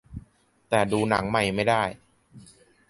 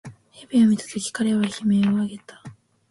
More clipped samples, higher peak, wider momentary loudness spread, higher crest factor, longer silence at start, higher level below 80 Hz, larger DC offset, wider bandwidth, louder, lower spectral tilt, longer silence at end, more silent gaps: neither; about the same, -6 dBFS vs -8 dBFS; about the same, 13 LU vs 11 LU; first, 22 dB vs 14 dB; about the same, 0.1 s vs 0.05 s; first, -52 dBFS vs -62 dBFS; neither; about the same, 11.5 kHz vs 11.5 kHz; about the same, -24 LUFS vs -22 LUFS; about the same, -5 dB/octave vs -5.5 dB/octave; about the same, 0.5 s vs 0.4 s; neither